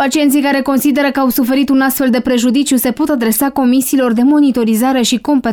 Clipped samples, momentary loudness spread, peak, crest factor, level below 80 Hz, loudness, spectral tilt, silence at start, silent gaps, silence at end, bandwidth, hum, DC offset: under 0.1%; 2 LU; -4 dBFS; 8 dB; -46 dBFS; -12 LUFS; -3.5 dB/octave; 0 s; none; 0 s; 20 kHz; none; 0.1%